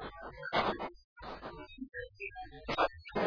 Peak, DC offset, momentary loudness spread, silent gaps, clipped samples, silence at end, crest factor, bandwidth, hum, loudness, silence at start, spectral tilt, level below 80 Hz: -18 dBFS; under 0.1%; 14 LU; 1.04-1.16 s; under 0.1%; 0 s; 20 dB; 5.4 kHz; none; -38 LUFS; 0 s; -2.5 dB/octave; -58 dBFS